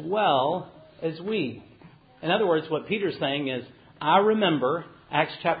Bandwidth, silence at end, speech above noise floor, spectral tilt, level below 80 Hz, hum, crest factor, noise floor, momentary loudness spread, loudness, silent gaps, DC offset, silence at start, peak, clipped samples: 5 kHz; 0 s; 27 dB; -10 dB/octave; -66 dBFS; none; 20 dB; -52 dBFS; 12 LU; -26 LUFS; none; under 0.1%; 0 s; -6 dBFS; under 0.1%